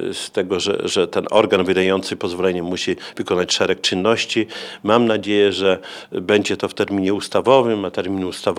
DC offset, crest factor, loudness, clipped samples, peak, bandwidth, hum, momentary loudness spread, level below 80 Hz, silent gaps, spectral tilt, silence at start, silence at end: under 0.1%; 18 dB; -19 LUFS; under 0.1%; 0 dBFS; 13.5 kHz; none; 8 LU; -60 dBFS; none; -4 dB/octave; 0 s; 0 s